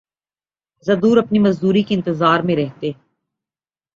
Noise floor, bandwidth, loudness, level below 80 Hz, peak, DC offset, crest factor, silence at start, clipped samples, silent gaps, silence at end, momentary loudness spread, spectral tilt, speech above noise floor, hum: under -90 dBFS; 7.6 kHz; -17 LUFS; -56 dBFS; -2 dBFS; under 0.1%; 16 dB; 0.85 s; under 0.1%; none; 1.05 s; 12 LU; -7.5 dB/octave; over 74 dB; none